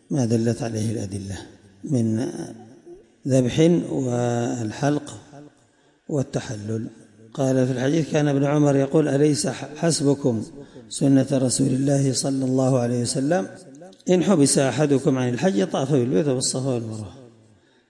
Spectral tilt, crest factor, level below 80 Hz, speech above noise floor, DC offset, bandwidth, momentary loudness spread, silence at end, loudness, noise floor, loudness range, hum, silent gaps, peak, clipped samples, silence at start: -5.5 dB/octave; 16 dB; -60 dBFS; 38 dB; under 0.1%; 11.5 kHz; 15 LU; 0.6 s; -22 LUFS; -59 dBFS; 6 LU; none; none; -6 dBFS; under 0.1%; 0.1 s